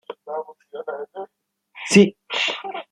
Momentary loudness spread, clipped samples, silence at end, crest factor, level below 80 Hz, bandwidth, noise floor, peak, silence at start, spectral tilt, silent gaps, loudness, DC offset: 21 LU; under 0.1%; 0.1 s; 22 dB; -66 dBFS; 11 kHz; -42 dBFS; -2 dBFS; 0.1 s; -4.5 dB/octave; none; -20 LUFS; under 0.1%